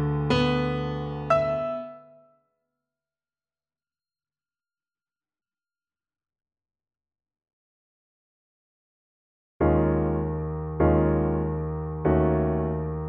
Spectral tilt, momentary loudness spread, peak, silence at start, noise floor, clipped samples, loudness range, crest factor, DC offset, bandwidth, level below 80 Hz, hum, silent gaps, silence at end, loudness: -8.5 dB/octave; 9 LU; -8 dBFS; 0 s; under -90 dBFS; under 0.1%; 8 LU; 20 dB; under 0.1%; 7.4 kHz; -38 dBFS; none; 7.53-9.60 s; 0 s; -25 LUFS